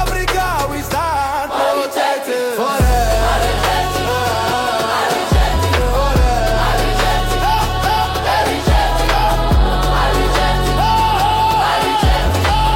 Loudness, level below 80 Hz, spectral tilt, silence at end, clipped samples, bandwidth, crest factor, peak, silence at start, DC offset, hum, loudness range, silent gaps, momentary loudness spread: -15 LUFS; -20 dBFS; -4.5 dB/octave; 0 s; under 0.1%; 16.5 kHz; 12 dB; -4 dBFS; 0 s; under 0.1%; none; 2 LU; none; 3 LU